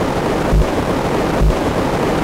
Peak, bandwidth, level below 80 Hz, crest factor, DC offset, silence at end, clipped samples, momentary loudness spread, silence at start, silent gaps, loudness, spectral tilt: -4 dBFS; 16 kHz; -22 dBFS; 12 dB; under 0.1%; 0 s; under 0.1%; 1 LU; 0 s; none; -17 LUFS; -6.5 dB/octave